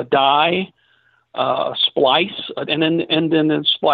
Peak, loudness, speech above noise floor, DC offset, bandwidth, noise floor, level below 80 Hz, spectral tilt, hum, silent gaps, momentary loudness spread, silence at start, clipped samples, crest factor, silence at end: -4 dBFS; -17 LUFS; 42 dB; under 0.1%; 4.8 kHz; -59 dBFS; -62 dBFS; -8.5 dB/octave; none; none; 9 LU; 0 s; under 0.1%; 14 dB; 0 s